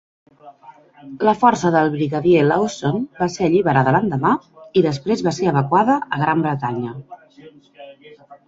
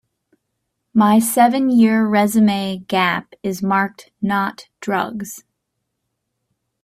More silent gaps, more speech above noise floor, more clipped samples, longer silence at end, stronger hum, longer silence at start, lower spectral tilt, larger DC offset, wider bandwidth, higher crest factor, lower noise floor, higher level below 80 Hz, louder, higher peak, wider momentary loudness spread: neither; second, 28 dB vs 59 dB; neither; second, 0.1 s vs 1.45 s; neither; second, 0.45 s vs 0.95 s; first, -6.5 dB/octave vs -5 dB/octave; neither; second, 7.8 kHz vs 16 kHz; about the same, 18 dB vs 18 dB; second, -46 dBFS vs -76 dBFS; first, -54 dBFS vs -60 dBFS; about the same, -18 LUFS vs -17 LUFS; about the same, -2 dBFS vs -2 dBFS; second, 8 LU vs 12 LU